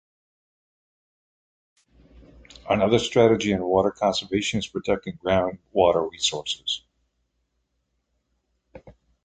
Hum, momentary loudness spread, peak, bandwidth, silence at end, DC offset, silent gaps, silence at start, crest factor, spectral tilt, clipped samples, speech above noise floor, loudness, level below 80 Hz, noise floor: none; 9 LU; -4 dBFS; 9.4 kHz; 0.35 s; under 0.1%; none; 2.65 s; 22 dB; -4.5 dB/octave; under 0.1%; 52 dB; -23 LUFS; -52 dBFS; -75 dBFS